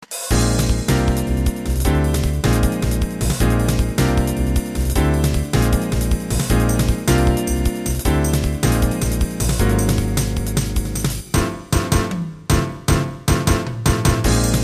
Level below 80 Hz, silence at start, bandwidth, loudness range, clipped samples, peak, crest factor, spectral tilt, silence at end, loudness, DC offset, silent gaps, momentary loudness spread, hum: -22 dBFS; 0.1 s; 14 kHz; 2 LU; under 0.1%; -4 dBFS; 14 dB; -5.5 dB/octave; 0 s; -19 LUFS; under 0.1%; none; 4 LU; none